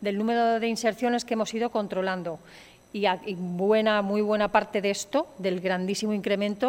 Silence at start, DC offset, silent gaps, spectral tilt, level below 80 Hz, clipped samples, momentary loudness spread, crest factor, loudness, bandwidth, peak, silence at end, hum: 0 s; under 0.1%; none; -5 dB/octave; -64 dBFS; under 0.1%; 7 LU; 20 dB; -26 LUFS; 16.5 kHz; -8 dBFS; 0 s; none